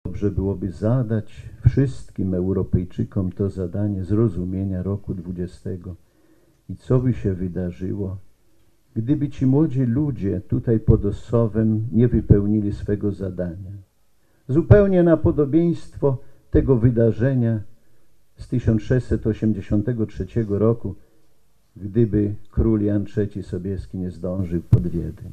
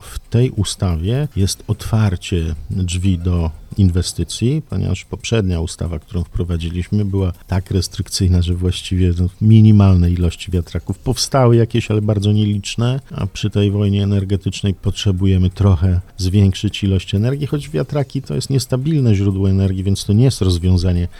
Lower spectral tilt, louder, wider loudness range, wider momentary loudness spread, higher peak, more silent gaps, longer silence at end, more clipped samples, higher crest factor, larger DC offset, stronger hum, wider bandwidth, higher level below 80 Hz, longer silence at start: first, -10.5 dB/octave vs -6.5 dB/octave; second, -22 LUFS vs -17 LUFS; about the same, 7 LU vs 5 LU; first, 12 LU vs 8 LU; about the same, 0 dBFS vs 0 dBFS; neither; about the same, 0 s vs 0 s; neither; about the same, 20 dB vs 16 dB; neither; neither; second, 8.6 kHz vs 13 kHz; about the same, -36 dBFS vs -32 dBFS; about the same, 0.05 s vs 0 s